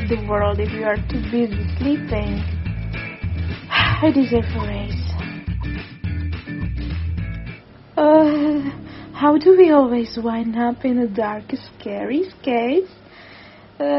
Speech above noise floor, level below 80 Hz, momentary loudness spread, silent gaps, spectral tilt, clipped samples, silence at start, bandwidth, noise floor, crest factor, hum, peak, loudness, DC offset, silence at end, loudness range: 25 dB; -32 dBFS; 15 LU; none; -5.5 dB/octave; under 0.1%; 0 s; 6 kHz; -43 dBFS; 18 dB; none; -2 dBFS; -20 LUFS; under 0.1%; 0 s; 7 LU